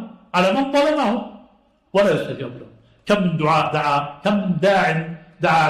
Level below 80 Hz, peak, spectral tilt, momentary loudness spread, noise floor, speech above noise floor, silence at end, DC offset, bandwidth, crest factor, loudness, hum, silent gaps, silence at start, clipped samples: -54 dBFS; -6 dBFS; -6 dB/octave; 12 LU; -56 dBFS; 37 dB; 0 s; under 0.1%; 13.5 kHz; 14 dB; -19 LUFS; none; none; 0 s; under 0.1%